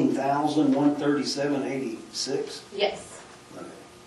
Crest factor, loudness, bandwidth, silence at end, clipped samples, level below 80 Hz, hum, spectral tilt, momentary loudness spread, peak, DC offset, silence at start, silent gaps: 16 dB; -26 LUFS; 12 kHz; 0 s; under 0.1%; -68 dBFS; none; -4.5 dB/octave; 20 LU; -10 dBFS; under 0.1%; 0 s; none